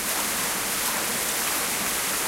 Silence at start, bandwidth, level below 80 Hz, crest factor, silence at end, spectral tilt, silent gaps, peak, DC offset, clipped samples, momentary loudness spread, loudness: 0 s; 16 kHz; -54 dBFS; 16 dB; 0 s; -0.5 dB/octave; none; -12 dBFS; under 0.1%; under 0.1%; 1 LU; -24 LUFS